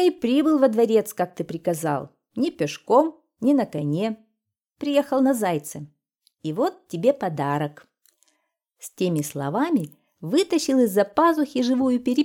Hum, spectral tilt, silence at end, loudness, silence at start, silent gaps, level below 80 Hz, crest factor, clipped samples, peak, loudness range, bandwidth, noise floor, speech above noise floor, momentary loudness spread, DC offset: none; -6 dB/octave; 0 s; -23 LUFS; 0 s; none; -68 dBFS; 18 dB; under 0.1%; -4 dBFS; 5 LU; 17.5 kHz; -78 dBFS; 56 dB; 12 LU; under 0.1%